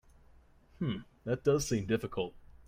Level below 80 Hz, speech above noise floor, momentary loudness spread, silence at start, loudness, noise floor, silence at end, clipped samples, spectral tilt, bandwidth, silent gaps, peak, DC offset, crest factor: -56 dBFS; 28 dB; 10 LU; 0.8 s; -34 LUFS; -61 dBFS; 0.15 s; under 0.1%; -5.5 dB/octave; 16 kHz; none; -16 dBFS; under 0.1%; 20 dB